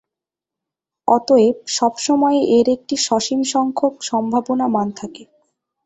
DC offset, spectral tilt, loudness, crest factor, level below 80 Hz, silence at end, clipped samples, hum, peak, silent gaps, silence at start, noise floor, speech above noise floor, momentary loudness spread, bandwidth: under 0.1%; -4 dB/octave; -17 LUFS; 16 dB; -60 dBFS; 0.6 s; under 0.1%; none; -2 dBFS; none; 1.05 s; -86 dBFS; 69 dB; 7 LU; 8.2 kHz